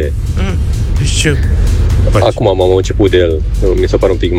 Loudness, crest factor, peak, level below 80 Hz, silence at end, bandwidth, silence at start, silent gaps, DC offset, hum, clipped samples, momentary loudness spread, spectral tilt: -12 LUFS; 10 dB; 0 dBFS; -14 dBFS; 0 s; 13.5 kHz; 0 s; none; under 0.1%; none; under 0.1%; 5 LU; -6 dB/octave